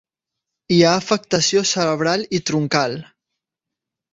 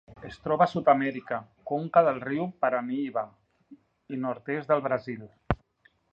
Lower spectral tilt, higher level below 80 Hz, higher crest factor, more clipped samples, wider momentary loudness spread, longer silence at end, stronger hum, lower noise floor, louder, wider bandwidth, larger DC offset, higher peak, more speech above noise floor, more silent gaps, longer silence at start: second, -4 dB/octave vs -8.5 dB/octave; second, -58 dBFS vs -52 dBFS; second, 18 dB vs 24 dB; neither; second, 6 LU vs 15 LU; first, 1.1 s vs 0.55 s; neither; first, -85 dBFS vs -66 dBFS; first, -18 LUFS vs -28 LUFS; about the same, 8 kHz vs 7.4 kHz; neither; about the same, -2 dBFS vs -4 dBFS; first, 67 dB vs 39 dB; neither; first, 0.7 s vs 0.1 s